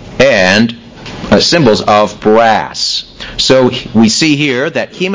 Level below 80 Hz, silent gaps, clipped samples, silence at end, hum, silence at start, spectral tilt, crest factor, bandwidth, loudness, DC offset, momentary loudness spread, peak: -38 dBFS; none; 0.3%; 0 s; none; 0 s; -4 dB/octave; 10 dB; 8 kHz; -9 LUFS; 0.7%; 9 LU; 0 dBFS